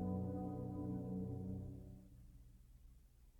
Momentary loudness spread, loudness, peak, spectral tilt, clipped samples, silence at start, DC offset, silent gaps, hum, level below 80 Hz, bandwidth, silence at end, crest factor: 22 LU; -46 LUFS; -32 dBFS; -11 dB/octave; under 0.1%; 0 s; under 0.1%; none; none; -62 dBFS; 17.5 kHz; 0 s; 16 dB